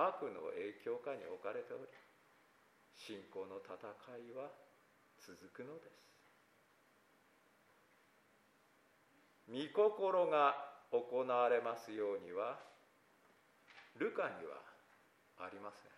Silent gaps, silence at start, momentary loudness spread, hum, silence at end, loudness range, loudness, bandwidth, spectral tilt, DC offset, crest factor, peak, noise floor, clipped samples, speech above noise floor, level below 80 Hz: none; 0 s; 20 LU; none; 0.1 s; 21 LU; -41 LUFS; 14 kHz; -5 dB/octave; under 0.1%; 24 dB; -20 dBFS; -72 dBFS; under 0.1%; 31 dB; under -90 dBFS